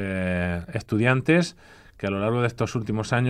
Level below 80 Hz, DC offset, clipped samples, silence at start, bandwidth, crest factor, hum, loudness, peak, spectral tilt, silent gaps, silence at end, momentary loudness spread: -52 dBFS; under 0.1%; under 0.1%; 0 s; 11 kHz; 18 dB; none; -25 LUFS; -6 dBFS; -6.5 dB/octave; none; 0 s; 9 LU